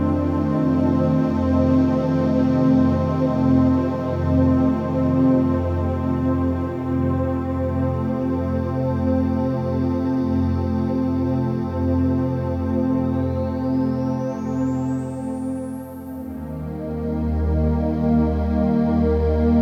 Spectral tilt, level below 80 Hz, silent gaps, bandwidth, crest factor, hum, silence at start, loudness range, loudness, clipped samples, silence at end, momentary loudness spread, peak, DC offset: -10 dB/octave; -32 dBFS; none; 6.6 kHz; 14 dB; none; 0 s; 6 LU; -21 LUFS; under 0.1%; 0 s; 8 LU; -6 dBFS; under 0.1%